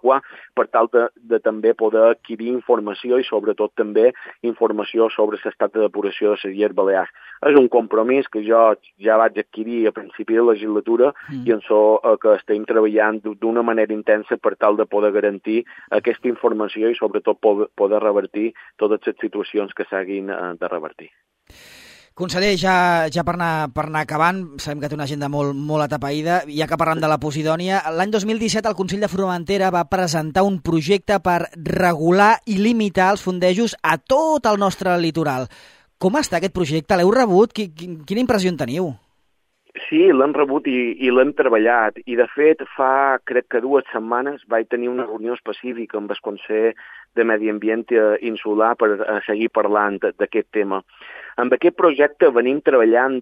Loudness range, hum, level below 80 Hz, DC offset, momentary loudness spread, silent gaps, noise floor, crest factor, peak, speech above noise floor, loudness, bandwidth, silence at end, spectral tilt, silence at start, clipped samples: 5 LU; none; -54 dBFS; under 0.1%; 10 LU; none; -69 dBFS; 18 dB; 0 dBFS; 50 dB; -19 LUFS; 15.5 kHz; 0 s; -5.5 dB/octave; 0.05 s; under 0.1%